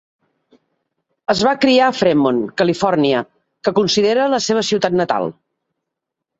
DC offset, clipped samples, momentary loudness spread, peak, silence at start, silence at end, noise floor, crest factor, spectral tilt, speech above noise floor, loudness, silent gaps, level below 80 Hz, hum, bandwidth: under 0.1%; under 0.1%; 8 LU; -2 dBFS; 1.3 s; 1.1 s; -80 dBFS; 16 dB; -4.5 dB/octave; 65 dB; -16 LUFS; none; -56 dBFS; none; 8 kHz